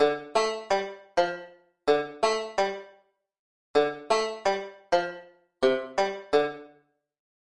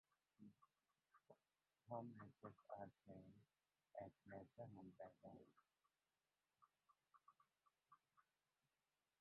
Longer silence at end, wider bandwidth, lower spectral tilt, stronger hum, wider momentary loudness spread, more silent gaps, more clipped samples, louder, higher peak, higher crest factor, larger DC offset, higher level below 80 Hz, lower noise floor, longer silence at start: second, 0.8 s vs 1 s; first, 10.5 kHz vs 4.2 kHz; second, -3 dB/octave vs -7.5 dB/octave; neither; second, 7 LU vs 10 LU; first, 3.39-3.74 s vs none; neither; first, -28 LUFS vs -61 LUFS; first, -10 dBFS vs -38 dBFS; second, 20 dB vs 26 dB; neither; first, -64 dBFS vs under -90 dBFS; second, -63 dBFS vs under -90 dBFS; second, 0 s vs 0.4 s